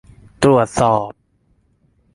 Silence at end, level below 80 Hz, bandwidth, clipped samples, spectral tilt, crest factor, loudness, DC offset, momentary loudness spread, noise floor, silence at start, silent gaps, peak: 1.05 s; -46 dBFS; 11.5 kHz; under 0.1%; -6 dB/octave; 18 dB; -16 LUFS; under 0.1%; 8 LU; -60 dBFS; 0.4 s; none; -2 dBFS